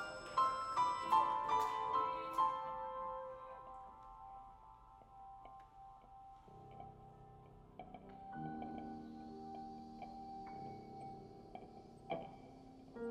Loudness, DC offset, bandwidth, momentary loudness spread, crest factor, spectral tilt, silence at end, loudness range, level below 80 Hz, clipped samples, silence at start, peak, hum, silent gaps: -41 LUFS; under 0.1%; 14.5 kHz; 22 LU; 22 dB; -5 dB/octave; 0 s; 19 LU; -68 dBFS; under 0.1%; 0 s; -22 dBFS; none; none